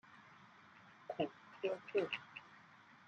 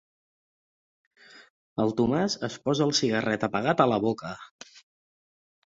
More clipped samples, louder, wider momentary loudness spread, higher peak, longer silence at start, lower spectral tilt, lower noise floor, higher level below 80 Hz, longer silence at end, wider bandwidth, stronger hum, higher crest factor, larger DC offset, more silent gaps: neither; second, -43 LUFS vs -26 LUFS; first, 22 LU vs 15 LU; second, -24 dBFS vs -6 dBFS; second, 0.05 s vs 1.35 s; about the same, -6 dB/octave vs -5 dB/octave; second, -63 dBFS vs under -90 dBFS; second, -90 dBFS vs -62 dBFS; second, 0.1 s vs 0.95 s; about the same, 7.6 kHz vs 7.8 kHz; neither; about the same, 22 dB vs 24 dB; neither; second, none vs 1.50-1.76 s, 4.51-4.59 s